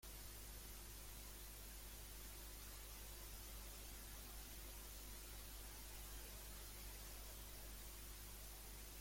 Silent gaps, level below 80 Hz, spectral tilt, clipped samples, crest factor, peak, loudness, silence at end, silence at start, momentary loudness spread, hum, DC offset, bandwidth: none; -58 dBFS; -2.5 dB/octave; under 0.1%; 12 dB; -42 dBFS; -55 LUFS; 0 s; 0 s; 1 LU; 50 Hz at -60 dBFS; under 0.1%; 16.5 kHz